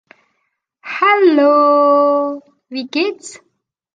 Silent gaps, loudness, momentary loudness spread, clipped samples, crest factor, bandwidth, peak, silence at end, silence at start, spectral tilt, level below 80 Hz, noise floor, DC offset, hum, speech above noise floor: none; -13 LUFS; 21 LU; under 0.1%; 14 dB; 9.4 kHz; -2 dBFS; 0.6 s; 0.85 s; -3 dB/octave; -70 dBFS; -70 dBFS; under 0.1%; none; 57 dB